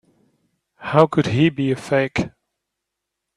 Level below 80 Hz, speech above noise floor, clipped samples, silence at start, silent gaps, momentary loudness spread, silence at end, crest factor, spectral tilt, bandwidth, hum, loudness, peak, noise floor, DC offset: -52 dBFS; 63 dB; under 0.1%; 0.8 s; none; 11 LU; 1.1 s; 22 dB; -7 dB/octave; 11.5 kHz; none; -19 LUFS; 0 dBFS; -81 dBFS; under 0.1%